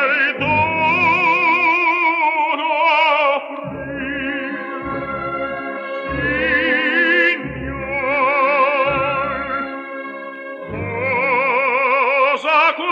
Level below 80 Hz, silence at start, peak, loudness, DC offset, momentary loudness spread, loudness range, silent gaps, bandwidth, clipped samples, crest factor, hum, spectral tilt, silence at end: -46 dBFS; 0 s; -4 dBFS; -16 LUFS; under 0.1%; 13 LU; 5 LU; none; 7.8 kHz; under 0.1%; 14 dB; none; -6 dB/octave; 0 s